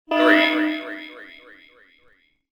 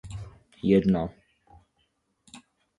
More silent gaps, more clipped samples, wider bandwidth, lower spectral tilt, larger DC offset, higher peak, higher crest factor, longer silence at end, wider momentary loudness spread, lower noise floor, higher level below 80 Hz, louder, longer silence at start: neither; neither; first, 18 kHz vs 10.5 kHz; second, -3.5 dB/octave vs -8.5 dB/octave; neither; first, -4 dBFS vs -10 dBFS; about the same, 20 dB vs 20 dB; first, 1.3 s vs 0.4 s; first, 25 LU vs 20 LU; second, -60 dBFS vs -73 dBFS; second, -70 dBFS vs -52 dBFS; first, -18 LUFS vs -25 LUFS; about the same, 0.1 s vs 0.05 s